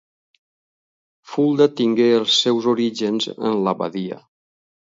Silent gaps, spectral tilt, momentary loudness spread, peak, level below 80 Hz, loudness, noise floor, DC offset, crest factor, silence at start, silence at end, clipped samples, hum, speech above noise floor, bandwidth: none; -4.5 dB/octave; 13 LU; -2 dBFS; -70 dBFS; -19 LUFS; under -90 dBFS; under 0.1%; 18 dB; 1.3 s; 0.7 s; under 0.1%; none; over 72 dB; 7.8 kHz